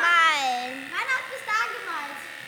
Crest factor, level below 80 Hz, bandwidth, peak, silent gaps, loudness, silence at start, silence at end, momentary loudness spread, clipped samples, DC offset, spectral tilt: 18 dB; -86 dBFS; over 20 kHz; -8 dBFS; none; -25 LUFS; 0 s; 0 s; 13 LU; under 0.1%; under 0.1%; 0 dB/octave